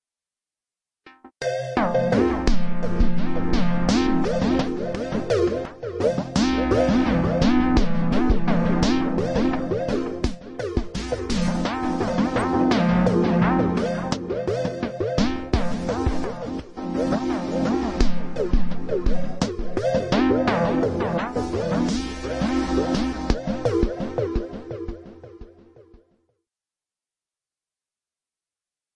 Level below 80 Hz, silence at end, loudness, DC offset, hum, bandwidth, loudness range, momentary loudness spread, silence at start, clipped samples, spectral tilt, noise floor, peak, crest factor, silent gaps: -32 dBFS; 3.5 s; -23 LUFS; under 0.1%; none; 10.5 kHz; 5 LU; 9 LU; 1.05 s; under 0.1%; -6.5 dB/octave; under -90 dBFS; -6 dBFS; 16 dB; none